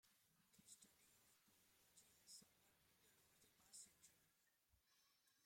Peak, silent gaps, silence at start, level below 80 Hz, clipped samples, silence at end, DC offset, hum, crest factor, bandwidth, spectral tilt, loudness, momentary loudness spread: -50 dBFS; none; 0.05 s; under -90 dBFS; under 0.1%; 0 s; under 0.1%; none; 24 dB; 16.5 kHz; -0.5 dB/octave; -65 LUFS; 4 LU